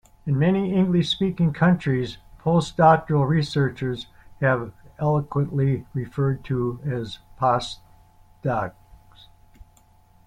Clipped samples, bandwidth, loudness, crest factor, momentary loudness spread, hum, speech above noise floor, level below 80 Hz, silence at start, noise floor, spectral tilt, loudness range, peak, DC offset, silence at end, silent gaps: under 0.1%; 10 kHz; -23 LUFS; 20 dB; 12 LU; none; 34 dB; -50 dBFS; 0.25 s; -55 dBFS; -7.5 dB/octave; 7 LU; -2 dBFS; under 0.1%; 1.55 s; none